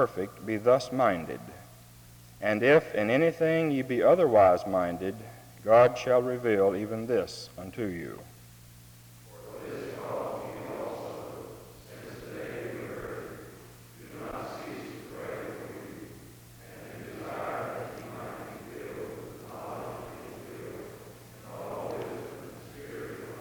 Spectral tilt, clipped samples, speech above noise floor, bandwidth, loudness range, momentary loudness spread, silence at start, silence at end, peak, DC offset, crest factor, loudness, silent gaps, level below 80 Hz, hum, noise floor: -6 dB/octave; under 0.1%; 26 dB; over 20 kHz; 17 LU; 24 LU; 0 s; 0 s; -10 dBFS; under 0.1%; 22 dB; -29 LUFS; none; -62 dBFS; none; -52 dBFS